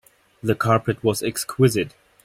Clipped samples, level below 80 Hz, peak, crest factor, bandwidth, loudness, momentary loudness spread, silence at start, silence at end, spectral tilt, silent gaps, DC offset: under 0.1%; -54 dBFS; -4 dBFS; 18 dB; 16.5 kHz; -22 LUFS; 8 LU; 0.45 s; 0.35 s; -5.5 dB/octave; none; under 0.1%